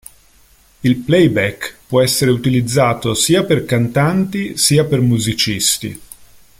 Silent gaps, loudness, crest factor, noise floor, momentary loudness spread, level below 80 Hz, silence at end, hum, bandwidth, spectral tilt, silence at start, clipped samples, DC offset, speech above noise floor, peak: none; -15 LUFS; 14 dB; -50 dBFS; 8 LU; -44 dBFS; 0.45 s; none; 16.5 kHz; -4.5 dB/octave; 0.85 s; under 0.1%; under 0.1%; 35 dB; 0 dBFS